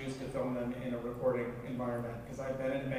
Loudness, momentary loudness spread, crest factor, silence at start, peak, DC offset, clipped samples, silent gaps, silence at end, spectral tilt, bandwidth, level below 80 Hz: -37 LUFS; 6 LU; 16 dB; 0 s; -20 dBFS; under 0.1%; under 0.1%; none; 0 s; -7 dB/octave; 15.5 kHz; -58 dBFS